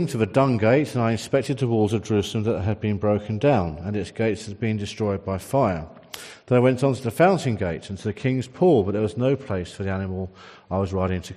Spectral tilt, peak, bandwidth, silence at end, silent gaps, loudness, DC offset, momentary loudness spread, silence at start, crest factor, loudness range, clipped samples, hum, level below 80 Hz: -7 dB/octave; -6 dBFS; 13.5 kHz; 0 s; none; -23 LUFS; under 0.1%; 11 LU; 0 s; 16 dB; 3 LU; under 0.1%; none; -54 dBFS